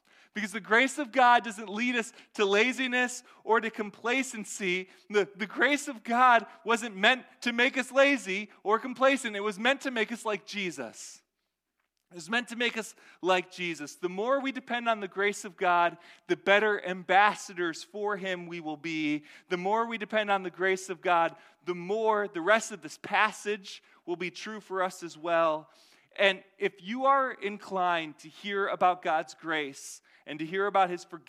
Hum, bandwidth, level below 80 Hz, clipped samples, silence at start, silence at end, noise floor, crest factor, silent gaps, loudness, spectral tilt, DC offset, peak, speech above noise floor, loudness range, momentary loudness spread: none; 15.5 kHz; -84 dBFS; under 0.1%; 0.35 s; 0.1 s; -84 dBFS; 22 dB; none; -28 LUFS; -3 dB/octave; under 0.1%; -6 dBFS; 54 dB; 5 LU; 13 LU